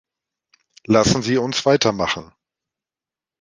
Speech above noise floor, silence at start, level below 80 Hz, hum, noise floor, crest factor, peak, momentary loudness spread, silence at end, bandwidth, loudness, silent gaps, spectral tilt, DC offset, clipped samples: over 72 dB; 0.9 s; -48 dBFS; none; under -90 dBFS; 20 dB; -2 dBFS; 7 LU; 1.15 s; 10 kHz; -18 LUFS; none; -4.5 dB/octave; under 0.1%; under 0.1%